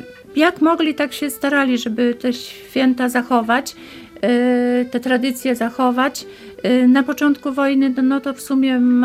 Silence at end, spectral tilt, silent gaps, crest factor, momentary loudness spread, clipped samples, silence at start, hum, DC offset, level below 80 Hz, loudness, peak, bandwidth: 0 s; -4 dB/octave; none; 16 dB; 9 LU; under 0.1%; 0 s; none; under 0.1%; -60 dBFS; -17 LUFS; -2 dBFS; 15.5 kHz